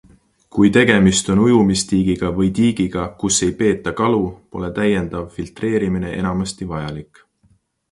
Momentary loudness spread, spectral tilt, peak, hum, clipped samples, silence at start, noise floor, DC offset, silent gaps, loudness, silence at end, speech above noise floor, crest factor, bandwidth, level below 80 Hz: 13 LU; -5 dB/octave; 0 dBFS; none; under 0.1%; 0.55 s; -59 dBFS; under 0.1%; none; -17 LUFS; 0.9 s; 42 dB; 18 dB; 11.5 kHz; -40 dBFS